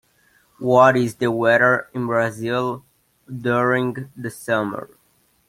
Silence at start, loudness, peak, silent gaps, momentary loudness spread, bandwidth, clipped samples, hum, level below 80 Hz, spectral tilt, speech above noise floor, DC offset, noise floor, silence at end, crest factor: 0.6 s; -19 LUFS; -2 dBFS; none; 16 LU; 16 kHz; under 0.1%; none; -62 dBFS; -6 dB/octave; 42 dB; under 0.1%; -62 dBFS; 0.6 s; 20 dB